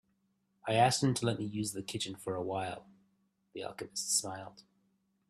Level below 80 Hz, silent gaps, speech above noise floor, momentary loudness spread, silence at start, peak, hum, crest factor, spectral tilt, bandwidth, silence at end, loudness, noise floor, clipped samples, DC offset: -70 dBFS; none; 43 dB; 17 LU; 0.65 s; -12 dBFS; none; 24 dB; -4 dB/octave; 14.5 kHz; 0.7 s; -34 LUFS; -77 dBFS; under 0.1%; under 0.1%